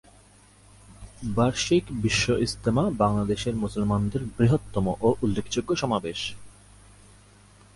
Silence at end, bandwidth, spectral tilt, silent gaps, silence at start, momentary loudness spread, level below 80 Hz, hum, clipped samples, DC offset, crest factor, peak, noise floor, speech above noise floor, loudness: 1.25 s; 11.5 kHz; -5.5 dB/octave; none; 0.9 s; 6 LU; -44 dBFS; 50 Hz at -40 dBFS; under 0.1%; under 0.1%; 18 dB; -8 dBFS; -54 dBFS; 30 dB; -25 LUFS